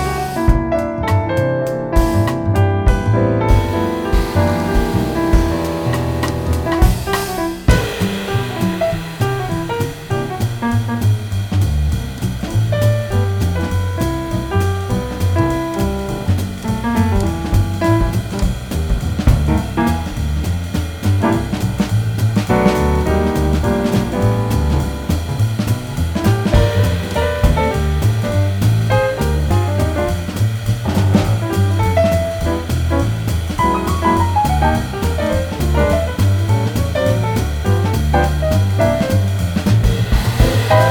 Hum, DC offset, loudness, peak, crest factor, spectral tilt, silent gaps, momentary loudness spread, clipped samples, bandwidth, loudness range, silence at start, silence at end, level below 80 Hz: none; under 0.1%; -17 LUFS; 0 dBFS; 14 dB; -6.5 dB/octave; none; 5 LU; under 0.1%; 19 kHz; 3 LU; 0 s; 0 s; -22 dBFS